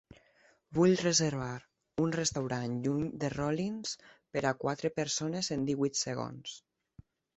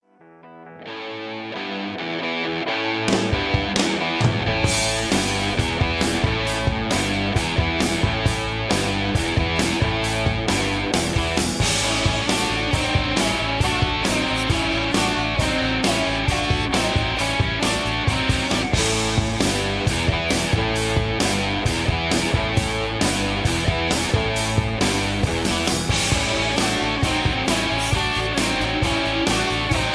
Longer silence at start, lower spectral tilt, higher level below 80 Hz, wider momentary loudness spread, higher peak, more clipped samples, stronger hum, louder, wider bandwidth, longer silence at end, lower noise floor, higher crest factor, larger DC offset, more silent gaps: first, 0.7 s vs 0.45 s; about the same, -4.5 dB/octave vs -4 dB/octave; second, -64 dBFS vs -32 dBFS; first, 14 LU vs 2 LU; second, -14 dBFS vs -4 dBFS; neither; neither; second, -32 LUFS vs -21 LUFS; second, 8.4 kHz vs 11 kHz; first, 0.75 s vs 0 s; first, -67 dBFS vs -48 dBFS; about the same, 18 dB vs 18 dB; neither; neither